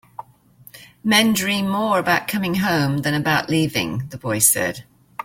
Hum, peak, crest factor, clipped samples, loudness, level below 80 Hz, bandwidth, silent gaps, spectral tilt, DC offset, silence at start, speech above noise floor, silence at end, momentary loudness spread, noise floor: none; 0 dBFS; 20 dB; under 0.1%; -19 LUFS; -54 dBFS; 16.5 kHz; none; -3.5 dB/octave; under 0.1%; 0.75 s; 30 dB; 0 s; 12 LU; -49 dBFS